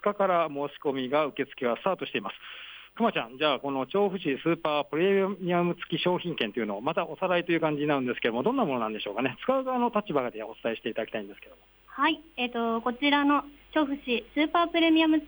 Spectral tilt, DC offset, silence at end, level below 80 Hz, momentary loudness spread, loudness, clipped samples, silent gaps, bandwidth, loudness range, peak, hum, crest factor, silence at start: -7.5 dB/octave; under 0.1%; 0 s; -66 dBFS; 8 LU; -28 LUFS; under 0.1%; none; over 20 kHz; 3 LU; -12 dBFS; none; 16 dB; 0.05 s